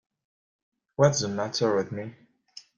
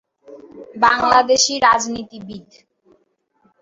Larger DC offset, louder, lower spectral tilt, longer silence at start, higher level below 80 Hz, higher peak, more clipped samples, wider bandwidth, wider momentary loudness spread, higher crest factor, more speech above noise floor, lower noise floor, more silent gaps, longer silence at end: neither; second, -26 LUFS vs -15 LUFS; first, -4.5 dB/octave vs -1 dB/octave; first, 1 s vs 0.3 s; second, -64 dBFS vs -54 dBFS; second, -6 dBFS vs 0 dBFS; neither; first, 9.2 kHz vs 8 kHz; second, 17 LU vs 23 LU; first, 24 dB vs 18 dB; second, 27 dB vs 47 dB; second, -52 dBFS vs -64 dBFS; neither; second, 0.15 s vs 1.2 s